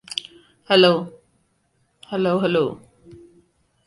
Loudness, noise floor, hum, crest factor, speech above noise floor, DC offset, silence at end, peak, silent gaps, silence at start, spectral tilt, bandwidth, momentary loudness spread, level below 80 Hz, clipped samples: -20 LUFS; -66 dBFS; none; 20 dB; 48 dB; under 0.1%; 1.1 s; -4 dBFS; none; 0.1 s; -5.5 dB/octave; 11.5 kHz; 17 LU; -64 dBFS; under 0.1%